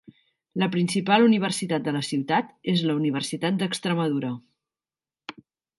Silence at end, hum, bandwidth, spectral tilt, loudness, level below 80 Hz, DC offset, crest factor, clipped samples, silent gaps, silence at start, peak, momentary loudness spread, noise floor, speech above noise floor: 0.5 s; none; 11.5 kHz; -5.5 dB/octave; -24 LUFS; -72 dBFS; under 0.1%; 22 dB; under 0.1%; none; 0.55 s; -4 dBFS; 18 LU; under -90 dBFS; over 66 dB